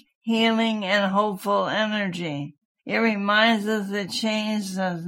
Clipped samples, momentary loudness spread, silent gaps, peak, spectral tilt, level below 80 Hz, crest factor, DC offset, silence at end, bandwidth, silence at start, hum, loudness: under 0.1%; 9 LU; 2.65-2.75 s; -6 dBFS; -4.5 dB/octave; -74 dBFS; 18 dB; under 0.1%; 0 s; 16 kHz; 0.25 s; none; -23 LUFS